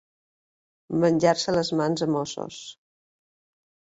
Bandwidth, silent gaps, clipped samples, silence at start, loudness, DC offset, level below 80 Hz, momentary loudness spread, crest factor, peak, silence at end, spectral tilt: 8 kHz; none; under 0.1%; 0.9 s; -24 LUFS; under 0.1%; -62 dBFS; 16 LU; 20 dB; -8 dBFS; 1.25 s; -5.5 dB/octave